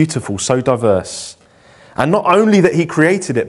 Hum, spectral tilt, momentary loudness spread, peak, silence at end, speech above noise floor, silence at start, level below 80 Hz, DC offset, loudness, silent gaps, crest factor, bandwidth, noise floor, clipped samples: none; -5.5 dB/octave; 16 LU; 0 dBFS; 0 s; 32 dB; 0 s; -50 dBFS; under 0.1%; -14 LUFS; none; 14 dB; 11.5 kHz; -45 dBFS; under 0.1%